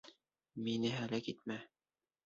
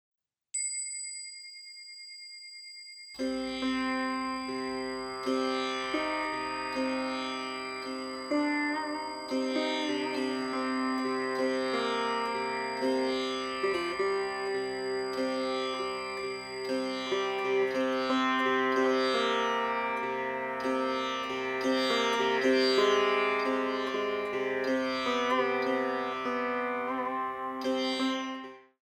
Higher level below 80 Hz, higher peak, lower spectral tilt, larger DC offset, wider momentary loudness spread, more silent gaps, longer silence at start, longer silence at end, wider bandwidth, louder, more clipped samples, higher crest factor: second, -78 dBFS vs -68 dBFS; second, -26 dBFS vs -14 dBFS; first, -4.5 dB/octave vs -2.5 dB/octave; neither; about the same, 10 LU vs 9 LU; neither; second, 0.05 s vs 0.55 s; first, 0.6 s vs 0.25 s; second, 7.6 kHz vs 14.5 kHz; second, -41 LUFS vs -31 LUFS; neither; about the same, 18 dB vs 16 dB